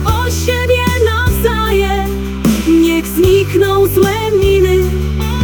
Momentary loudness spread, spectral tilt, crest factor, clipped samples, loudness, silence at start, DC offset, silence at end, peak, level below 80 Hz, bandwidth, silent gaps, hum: 5 LU; -5.5 dB/octave; 12 dB; under 0.1%; -12 LUFS; 0 s; under 0.1%; 0 s; 0 dBFS; -20 dBFS; 19.5 kHz; none; none